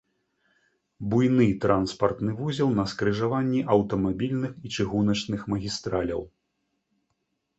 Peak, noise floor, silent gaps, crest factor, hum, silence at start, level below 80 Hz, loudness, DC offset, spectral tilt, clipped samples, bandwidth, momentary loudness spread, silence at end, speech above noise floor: -6 dBFS; -77 dBFS; none; 20 dB; none; 1 s; -52 dBFS; -26 LUFS; under 0.1%; -6.5 dB/octave; under 0.1%; 8.2 kHz; 8 LU; 1.3 s; 52 dB